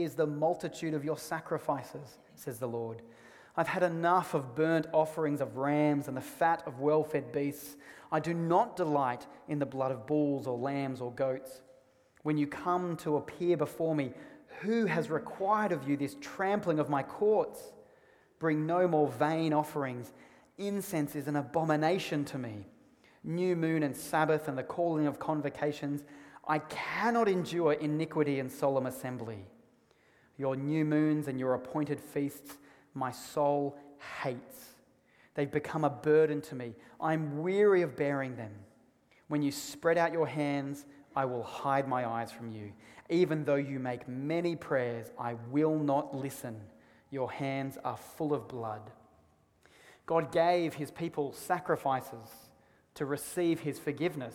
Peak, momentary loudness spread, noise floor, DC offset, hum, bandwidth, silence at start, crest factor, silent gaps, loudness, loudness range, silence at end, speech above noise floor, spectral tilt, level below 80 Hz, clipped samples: -14 dBFS; 14 LU; -67 dBFS; under 0.1%; none; 17.5 kHz; 0 s; 20 dB; none; -33 LUFS; 4 LU; 0 s; 35 dB; -6.5 dB/octave; -72 dBFS; under 0.1%